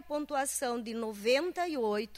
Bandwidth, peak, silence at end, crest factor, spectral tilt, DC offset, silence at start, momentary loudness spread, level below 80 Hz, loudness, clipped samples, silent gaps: 16 kHz; -16 dBFS; 0 s; 16 dB; -2.5 dB/octave; under 0.1%; 0 s; 6 LU; -66 dBFS; -32 LUFS; under 0.1%; none